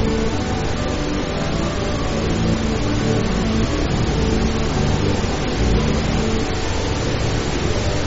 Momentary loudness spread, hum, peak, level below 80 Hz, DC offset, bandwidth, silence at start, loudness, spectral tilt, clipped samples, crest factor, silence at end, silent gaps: 3 LU; none; -4 dBFS; -26 dBFS; under 0.1%; 8 kHz; 0 s; -20 LUFS; -5.5 dB/octave; under 0.1%; 14 dB; 0 s; none